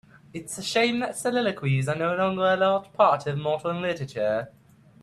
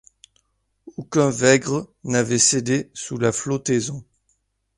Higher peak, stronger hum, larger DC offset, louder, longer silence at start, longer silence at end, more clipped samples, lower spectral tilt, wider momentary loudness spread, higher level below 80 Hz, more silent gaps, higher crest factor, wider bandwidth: second, -8 dBFS vs -2 dBFS; neither; neither; second, -25 LUFS vs -20 LUFS; second, 0.35 s vs 0.85 s; second, 0.55 s vs 0.75 s; neither; about the same, -5 dB/octave vs -4 dB/octave; second, 10 LU vs 14 LU; second, -64 dBFS vs -58 dBFS; neither; about the same, 18 dB vs 22 dB; first, 13.5 kHz vs 11.5 kHz